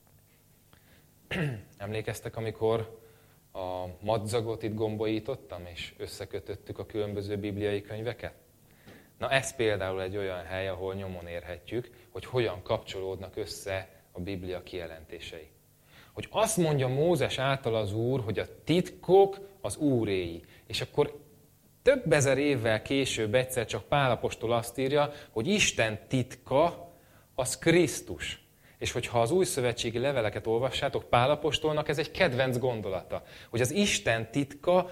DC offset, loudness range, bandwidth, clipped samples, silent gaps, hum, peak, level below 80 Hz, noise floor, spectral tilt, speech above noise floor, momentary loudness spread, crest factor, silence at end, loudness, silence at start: under 0.1%; 8 LU; 16.5 kHz; under 0.1%; none; none; -8 dBFS; -56 dBFS; -62 dBFS; -4.5 dB/octave; 32 dB; 14 LU; 22 dB; 0 s; -30 LUFS; 1.3 s